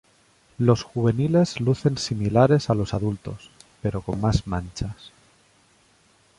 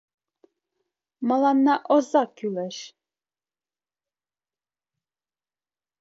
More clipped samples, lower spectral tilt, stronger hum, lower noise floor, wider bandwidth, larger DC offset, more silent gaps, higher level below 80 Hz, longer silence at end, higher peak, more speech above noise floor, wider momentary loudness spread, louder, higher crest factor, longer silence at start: neither; first, -7 dB/octave vs -5.5 dB/octave; neither; second, -60 dBFS vs under -90 dBFS; first, 11.5 kHz vs 7.8 kHz; neither; neither; first, -42 dBFS vs -80 dBFS; second, 1.3 s vs 3.15 s; about the same, -4 dBFS vs -6 dBFS; second, 37 dB vs over 68 dB; about the same, 14 LU vs 15 LU; about the same, -23 LUFS vs -23 LUFS; about the same, 20 dB vs 20 dB; second, 0.6 s vs 1.2 s